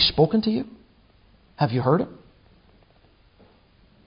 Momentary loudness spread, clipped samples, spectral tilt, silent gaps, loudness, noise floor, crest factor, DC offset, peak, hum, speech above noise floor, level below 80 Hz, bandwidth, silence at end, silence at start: 12 LU; under 0.1%; -10.5 dB/octave; none; -23 LUFS; -57 dBFS; 20 dB; under 0.1%; -6 dBFS; none; 35 dB; -52 dBFS; 5.4 kHz; 1.95 s; 0 s